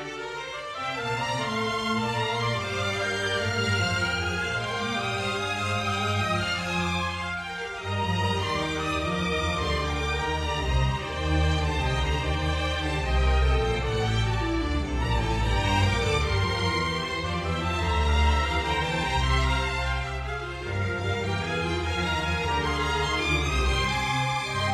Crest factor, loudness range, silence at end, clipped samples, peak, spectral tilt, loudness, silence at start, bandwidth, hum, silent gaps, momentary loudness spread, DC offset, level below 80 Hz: 16 dB; 2 LU; 0 s; under 0.1%; -10 dBFS; -5 dB/octave; -26 LUFS; 0 s; 13 kHz; none; none; 5 LU; under 0.1%; -32 dBFS